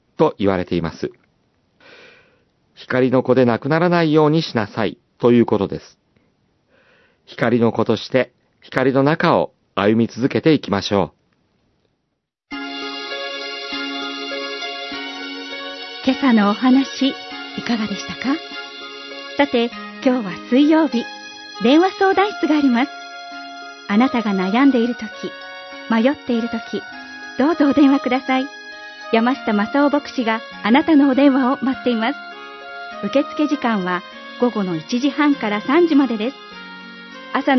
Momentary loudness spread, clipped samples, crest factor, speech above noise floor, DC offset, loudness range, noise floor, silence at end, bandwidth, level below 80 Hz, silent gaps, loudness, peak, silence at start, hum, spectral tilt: 17 LU; under 0.1%; 18 dB; 57 dB; under 0.1%; 6 LU; -74 dBFS; 0 s; 6.2 kHz; -60 dBFS; none; -18 LUFS; 0 dBFS; 0.2 s; none; -6.5 dB/octave